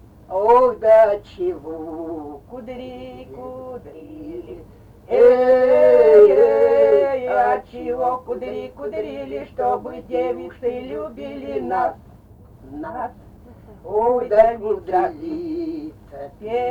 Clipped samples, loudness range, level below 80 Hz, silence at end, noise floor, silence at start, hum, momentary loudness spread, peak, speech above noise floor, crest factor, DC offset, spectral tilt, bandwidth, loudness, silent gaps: under 0.1%; 14 LU; -48 dBFS; 0 s; -45 dBFS; 0.3 s; none; 22 LU; -2 dBFS; 27 dB; 18 dB; under 0.1%; -7.5 dB/octave; 5.2 kHz; -17 LUFS; none